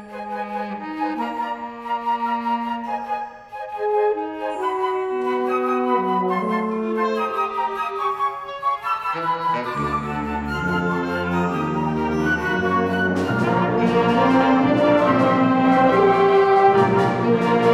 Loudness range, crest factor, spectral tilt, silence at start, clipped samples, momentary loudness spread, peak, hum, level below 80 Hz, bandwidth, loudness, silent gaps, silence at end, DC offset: 8 LU; 16 dB; -7 dB/octave; 0 s; under 0.1%; 11 LU; -4 dBFS; none; -48 dBFS; 12.5 kHz; -20 LUFS; none; 0 s; under 0.1%